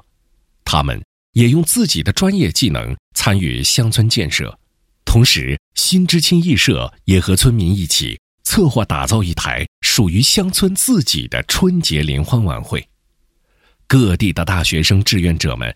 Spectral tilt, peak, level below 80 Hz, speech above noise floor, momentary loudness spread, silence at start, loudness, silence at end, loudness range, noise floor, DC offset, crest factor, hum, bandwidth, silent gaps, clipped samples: -4 dB/octave; 0 dBFS; -30 dBFS; 46 dB; 8 LU; 0.65 s; -15 LUFS; 0 s; 3 LU; -60 dBFS; under 0.1%; 16 dB; none; 16.5 kHz; 1.04-1.33 s, 2.99-3.11 s, 5.59-5.72 s, 8.19-8.38 s, 9.68-9.82 s; under 0.1%